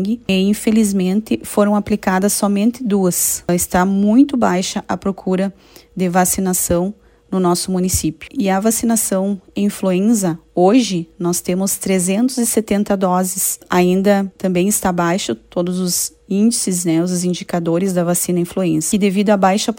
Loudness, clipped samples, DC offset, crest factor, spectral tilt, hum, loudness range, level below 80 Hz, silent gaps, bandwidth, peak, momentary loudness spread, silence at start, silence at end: -16 LUFS; under 0.1%; under 0.1%; 16 dB; -5 dB/octave; none; 2 LU; -44 dBFS; none; 16.5 kHz; 0 dBFS; 7 LU; 0 s; 0 s